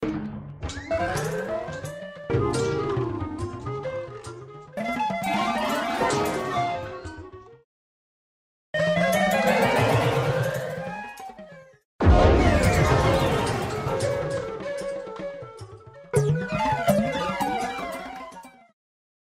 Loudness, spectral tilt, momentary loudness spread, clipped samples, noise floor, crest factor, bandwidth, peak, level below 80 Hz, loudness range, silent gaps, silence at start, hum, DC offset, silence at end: -25 LUFS; -6 dB/octave; 18 LU; under 0.1%; -46 dBFS; 20 dB; 16 kHz; -6 dBFS; -36 dBFS; 6 LU; 7.64-8.73 s, 11.85-11.99 s; 0 s; none; under 0.1%; 0.8 s